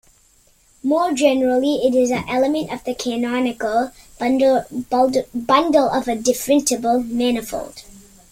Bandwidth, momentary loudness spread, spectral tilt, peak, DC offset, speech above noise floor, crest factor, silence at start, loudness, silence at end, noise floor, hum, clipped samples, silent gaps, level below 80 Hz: 16.5 kHz; 8 LU; -3.5 dB/octave; -2 dBFS; under 0.1%; 37 dB; 16 dB; 0.85 s; -19 LUFS; 0.35 s; -55 dBFS; none; under 0.1%; none; -50 dBFS